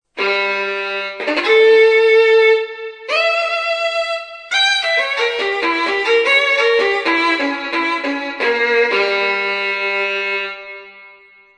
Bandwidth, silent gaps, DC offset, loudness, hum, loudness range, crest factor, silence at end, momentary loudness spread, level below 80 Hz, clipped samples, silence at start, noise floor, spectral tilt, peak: 10 kHz; none; under 0.1%; -15 LUFS; none; 3 LU; 16 dB; 0.5 s; 11 LU; -60 dBFS; under 0.1%; 0.15 s; -46 dBFS; -1.5 dB/octave; 0 dBFS